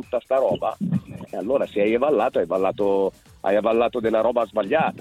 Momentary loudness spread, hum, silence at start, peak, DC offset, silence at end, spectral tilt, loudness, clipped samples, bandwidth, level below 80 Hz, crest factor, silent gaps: 7 LU; none; 0 s; -6 dBFS; under 0.1%; 0 s; -7.5 dB/octave; -22 LUFS; under 0.1%; 13 kHz; -56 dBFS; 14 dB; none